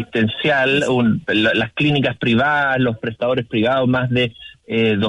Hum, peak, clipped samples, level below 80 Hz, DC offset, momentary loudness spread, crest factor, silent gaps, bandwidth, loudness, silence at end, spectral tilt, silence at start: none; -6 dBFS; under 0.1%; -50 dBFS; under 0.1%; 5 LU; 10 dB; none; 11 kHz; -17 LUFS; 0 s; -6.5 dB/octave; 0 s